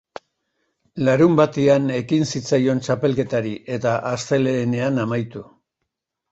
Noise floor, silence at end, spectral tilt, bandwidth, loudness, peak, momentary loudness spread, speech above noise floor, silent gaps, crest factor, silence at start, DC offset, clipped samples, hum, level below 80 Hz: -79 dBFS; 0.9 s; -6.5 dB/octave; 8.2 kHz; -20 LUFS; -2 dBFS; 9 LU; 60 dB; none; 18 dB; 0.95 s; under 0.1%; under 0.1%; none; -58 dBFS